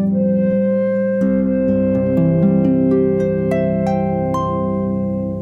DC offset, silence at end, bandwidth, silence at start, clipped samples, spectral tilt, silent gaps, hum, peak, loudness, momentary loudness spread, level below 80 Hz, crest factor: under 0.1%; 0 s; 6.6 kHz; 0 s; under 0.1%; -10.5 dB/octave; none; none; -4 dBFS; -17 LUFS; 5 LU; -42 dBFS; 12 dB